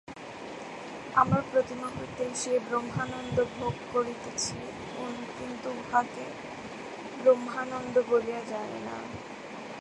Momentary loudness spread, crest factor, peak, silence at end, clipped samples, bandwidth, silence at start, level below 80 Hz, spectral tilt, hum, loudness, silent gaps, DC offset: 15 LU; 22 dB; -8 dBFS; 0 s; under 0.1%; 11.5 kHz; 0.05 s; -60 dBFS; -4.5 dB/octave; none; -31 LUFS; none; under 0.1%